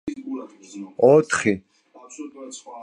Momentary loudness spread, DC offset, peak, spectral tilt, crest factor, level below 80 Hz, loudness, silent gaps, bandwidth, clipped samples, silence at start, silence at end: 22 LU; under 0.1%; -4 dBFS; -5 dB/octave; 20 dB; -60 dBFS; -19 LUFS; none; 11 kHz; under 0.1%; 0.05 s; 0 s